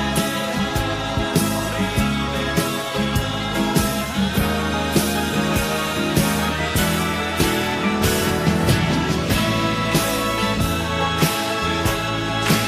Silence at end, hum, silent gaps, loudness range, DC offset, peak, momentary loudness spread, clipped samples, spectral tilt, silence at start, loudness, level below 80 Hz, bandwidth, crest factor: 0 s; none; none; 2 LU; under 0.1%; -4 dBFS; 3 LU; under 0.1%; -4.5 dB/octave; 0 s; -20 LUFS; -34 dBFS; 16 kHz; 16 dB